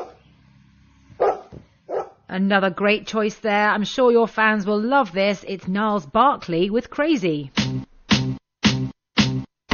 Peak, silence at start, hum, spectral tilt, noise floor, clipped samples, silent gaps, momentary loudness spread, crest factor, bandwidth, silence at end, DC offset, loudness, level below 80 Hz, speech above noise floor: -4 dBFS; 0 s; none; -3.5 dB/octave; -53 dBFS; under 0.1%; none; 11 LU; 18 dB; 7 kHz; 0 s; under 0.1%; -21 LUFS; -50 dBFS; 34 dB